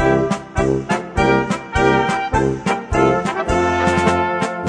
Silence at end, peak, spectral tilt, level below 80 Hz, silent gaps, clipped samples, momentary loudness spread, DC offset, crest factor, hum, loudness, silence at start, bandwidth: 0 s; -2 dBFS; -6 dB/octave; -32 dBFS; none; under 0.1%; 5 LU; under 0.1%; 16 dB; none; -17 LUFS; 0 s; 10.5 kHz